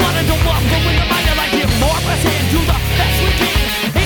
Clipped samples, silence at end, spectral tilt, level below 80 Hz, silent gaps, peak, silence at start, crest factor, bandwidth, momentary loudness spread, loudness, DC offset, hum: under 0.1%; 0 s; -4.5 dB/octave; -20 dBFS; none; -2 dBFS; 0 s; 12 dB; over 20 kHz; 1 LU; -14 LUFS; under 0.1%; none